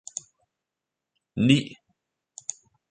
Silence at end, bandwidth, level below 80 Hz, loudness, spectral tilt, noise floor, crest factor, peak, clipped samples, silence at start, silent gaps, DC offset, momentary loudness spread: 1.2 s; 9.6 kHz; -62 dBFS; -25 LUFS; -4.5 dB/octave; -87 dBFS; 24 dB; -4 dBFS; under 0.1%; 1.35 s; none; under 0.1%; 18 LU